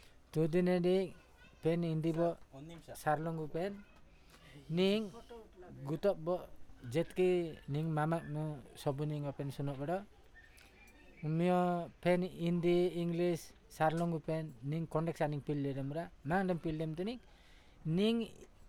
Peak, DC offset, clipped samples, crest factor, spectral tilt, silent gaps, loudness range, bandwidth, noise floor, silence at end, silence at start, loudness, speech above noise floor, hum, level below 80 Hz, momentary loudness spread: -18 dBFS; under 0.1%; under 0.1%; 18 dB; -7.5 dB/octave; none; 4 LU; 15 kHz; -60 dBFS; 0 s; 0.35 s; -36 LUFS; 25 dB; none; -62 dBFS; 14 LU